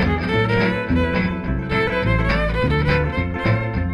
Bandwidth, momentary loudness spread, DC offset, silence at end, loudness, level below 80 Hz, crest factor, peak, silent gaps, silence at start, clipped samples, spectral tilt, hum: 11 kHz; 4 LU; under 0.1%; 0 s; -20 LUFS; -28 dBFS; 14 dB; -4 dBFS; none; 0 s; under 0.1%; -8 dB/octave; none